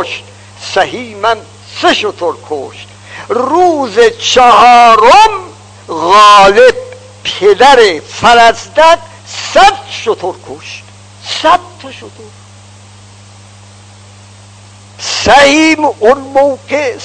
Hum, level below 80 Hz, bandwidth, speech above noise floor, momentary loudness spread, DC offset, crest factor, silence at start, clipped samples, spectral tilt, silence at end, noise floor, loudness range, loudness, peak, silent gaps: none; -40 dBFS; 11 kHz; 28 dB; 23 LU; under 0.1%; 10 dB; 0 s; 6%; -2.5 dB/octave; 0 s; -35 dBFS; 13 LU; -7 LUFS; 0 dBFS; none